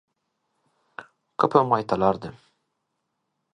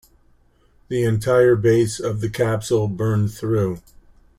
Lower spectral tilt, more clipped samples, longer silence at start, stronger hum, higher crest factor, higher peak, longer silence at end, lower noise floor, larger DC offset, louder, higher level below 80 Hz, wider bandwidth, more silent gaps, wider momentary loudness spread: about the same, -7.5 dB/octave vs -7 dB/octave; neither; about the same, 1 s vs 0.9 s; neither; first, 24 dB vs 16 dB; about the same, -2 dBFS vs -4 dBFS; first, 1.25 s vs 0.6 s; first, -78 dBFS vs -56 dBFS; neither; about the same, -22 LUFS vs -20 LUFS; second, -60 dBFS vs -48 dBFS; second, 10 kHz vs 15.5 kHz; neither; first, 23 LU vs 9 LU